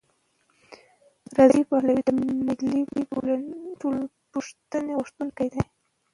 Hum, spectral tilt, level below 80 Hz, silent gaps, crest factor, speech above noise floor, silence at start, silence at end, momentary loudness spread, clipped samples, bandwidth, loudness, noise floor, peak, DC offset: none; -7 dB/octave; -56 dBFS; none; 22 dB; 44 dB; 0.7 s; 0.5 s; 15 LU; under 0.1%; 11 kHz; -25 LUFS; -68 dBFS; -4 dBFS; under 0.1%